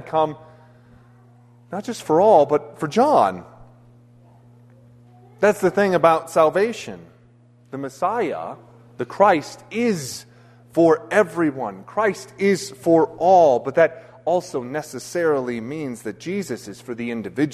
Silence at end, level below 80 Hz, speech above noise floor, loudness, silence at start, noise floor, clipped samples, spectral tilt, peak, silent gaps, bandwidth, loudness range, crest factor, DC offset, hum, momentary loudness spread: 0 s; -62 dBFS; 33 dB; -20 LUFS; 0 s; -52 dBFS; under 0.1%; -5.5 dB/octave; -2 dBFS; none; 13.5 kHz; 5 LU; 20 dB; under 0.1%; none; 16 LU